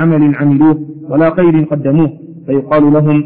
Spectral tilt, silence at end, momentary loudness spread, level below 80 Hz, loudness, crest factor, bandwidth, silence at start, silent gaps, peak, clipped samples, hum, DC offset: -13 dB/octave; 0 s; 8 LU; -44 dBFS; -11 LUFS; 8 dB; 3.9 kHz; 0 s; none; -2 dBFS; under 0.1%; none; 1%